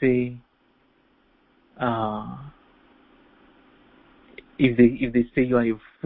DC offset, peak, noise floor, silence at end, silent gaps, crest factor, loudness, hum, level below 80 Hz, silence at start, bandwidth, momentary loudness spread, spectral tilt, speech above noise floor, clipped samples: under 0.1%; -4 dBFS; -63 dBFS; 0.3 s; none; 20 dB; -23 LUFS; none; -50 dBFS; 0 s; 4 kHz; 21 LU; -11.5 dB/octave; 43 dB; under 0.1%